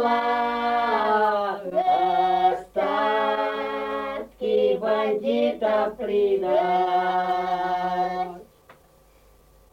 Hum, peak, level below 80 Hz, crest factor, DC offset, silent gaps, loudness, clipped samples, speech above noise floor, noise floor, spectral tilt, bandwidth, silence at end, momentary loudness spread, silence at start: none; -10 dBFS; -58 dBFS; 14 dB; under 0.1%; none; -23 LUFS; under 0.1%; 34 dB; -56 dBFS; -6 dB/octave; 16 kHz; 1 s; 7 LU; 0 s